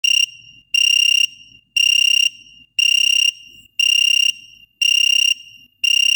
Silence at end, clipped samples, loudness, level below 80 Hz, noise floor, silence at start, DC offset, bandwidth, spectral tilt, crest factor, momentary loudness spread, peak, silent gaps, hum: 0 s; under 0.1%; -14 LUFS; -70 dBFS; -44 dBFS; 0.05 s; under 0.1%; over 20 kHz; 6 dB/octave; 12 dB; 9 LU; -6 dBFS; none; none